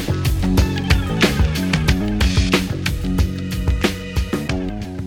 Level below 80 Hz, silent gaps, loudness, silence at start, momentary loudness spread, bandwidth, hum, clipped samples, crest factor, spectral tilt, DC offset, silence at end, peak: -24 dBFS; none; -19 LUFS; 0 s; 6 LU; 17 kHz; none; under 0.1%; 16 dB; -5.5 dB/octave; under 0.1%; 0 s; -2 dBFS